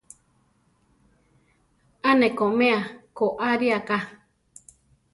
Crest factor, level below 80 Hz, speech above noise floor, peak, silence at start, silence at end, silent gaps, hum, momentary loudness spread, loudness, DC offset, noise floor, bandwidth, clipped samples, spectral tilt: 20 dB; -66 dBFS; 43 dB; -6 dBFS; 2.05 s; 1 s; none; none; 8 LU; -23 LUFS; under 0.1%; -65 dBFS; 11.5 kHz; under 0.1%; -5.5 dB/octave